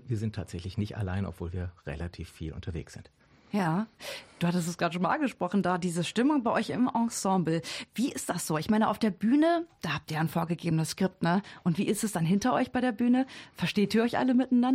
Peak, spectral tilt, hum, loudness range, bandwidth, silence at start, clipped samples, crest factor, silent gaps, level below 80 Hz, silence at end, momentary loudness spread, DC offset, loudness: -14 dBFS; -5.5 dB/octave; none; 7 LU; 16 kHz; 0.05 s; under 0.1%; 14 dB; none; -56 dBFS; 0 s; 12 LU; under 0.1%; -29 LUFS